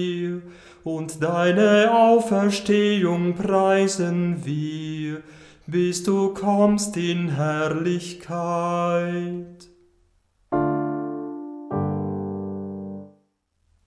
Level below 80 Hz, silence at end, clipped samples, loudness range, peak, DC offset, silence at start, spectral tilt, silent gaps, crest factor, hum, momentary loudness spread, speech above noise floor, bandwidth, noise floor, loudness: -58 dBFS; 0.8 s; under 0.1%; 9 LU; -6 dBFS; under 0.1%; 0 s; -6 dB/octave; none; 16 dB; none; 15 LU; 47 dB; 11 kHz; -68 dBFS; -22 LUFS